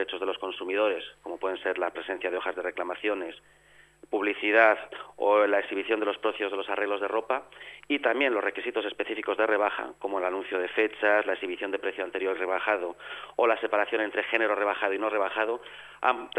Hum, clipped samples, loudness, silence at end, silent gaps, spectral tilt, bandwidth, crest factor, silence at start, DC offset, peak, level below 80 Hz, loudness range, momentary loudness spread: none; under 0.1%; -28 LUFS; 0 s; none; -4 dB/octave; 10.5 kHz; 22 dB; 0 s; under 0.1%; -6 dBFS; -72 dBFS; 5 LU; 10 LU